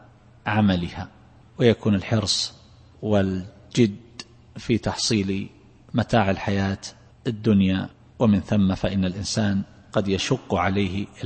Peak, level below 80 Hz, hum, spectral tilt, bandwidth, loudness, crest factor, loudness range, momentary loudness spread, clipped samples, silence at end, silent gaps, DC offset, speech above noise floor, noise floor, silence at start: -4 dBFS; -48 dBFS; none; -5.5 dB/octave; 8.8 kHz; -23 LUFS; 20 dB; 2 LU; 13 LU; under 0.1%; 0 s; none; under 0.1%; 22 dB; -44 dBFS; 0.45 s